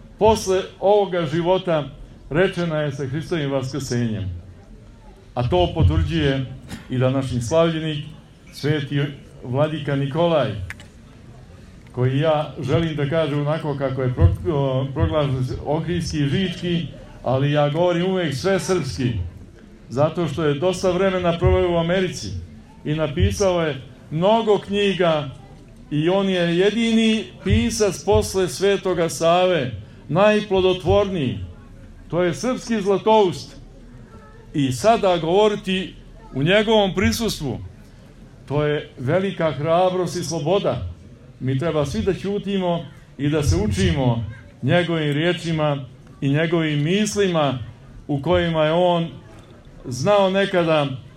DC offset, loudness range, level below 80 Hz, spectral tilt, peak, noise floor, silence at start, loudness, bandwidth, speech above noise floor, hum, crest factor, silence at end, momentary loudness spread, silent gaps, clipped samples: under 0.1%; 4 LU; -40 dBFS; -6 dB/octave; -2 dBFS; -44 dBFS; 0 s; -21 LUFS; 14.5 kHz; 24 dB; none; 18 dB; 0.05 s; 12 LU; none; under 0.1%